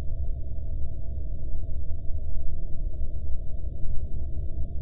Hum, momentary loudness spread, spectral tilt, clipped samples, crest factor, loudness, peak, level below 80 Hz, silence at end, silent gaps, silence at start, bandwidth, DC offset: none; 2 LU; -13.5 dB/octave; under 0.1%; 10 dB; -36 LUFS; -10 dBFS; -30 dBFS; 0 s; none; 0 s; 0.7 kHz; under 0.1%